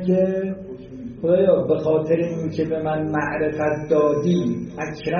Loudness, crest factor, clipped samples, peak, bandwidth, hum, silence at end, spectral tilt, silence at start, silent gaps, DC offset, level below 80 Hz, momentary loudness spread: -21 LUFS; 16 dB; under 0.1%; -4 dBFS; 6.8 kHz; none; 0 s; -7 dB/octave; 0 s; none; under 0.1%; -50 dBFS; 11 LU